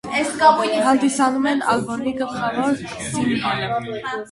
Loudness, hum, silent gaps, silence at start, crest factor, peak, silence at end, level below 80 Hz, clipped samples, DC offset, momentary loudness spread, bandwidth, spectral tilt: -20 LUFS; none; none; 0.05 s; 20 dB; 0 dBFS; 0 s; -54 dBFS; under 0.1%; under 0.1%; 10 LU; 11.5 kHz; -4 dB/octave